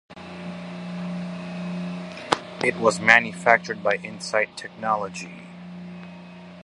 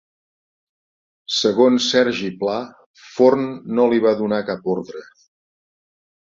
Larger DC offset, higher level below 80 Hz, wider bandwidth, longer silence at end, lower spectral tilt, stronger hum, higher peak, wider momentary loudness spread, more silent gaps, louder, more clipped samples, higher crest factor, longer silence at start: neither; about the same, -64 dBFS vs -64 dBFS; first, 11.5 kHz vs 7.8 kHz; second, 0.05 s vs 1.35 s; about the same, -4.5 dB/octave vs -4.5 dB/octave; neither; about the same, 0 dBFS vs -2 dBFS; first, 23 LU vs 18 LU; second, none vs 2.86-2.94 s; second, -23 LUFS vs -18 LUFS; neither; first, 26 dB vs 18 dB; second, 0.1 s vs 1.3 s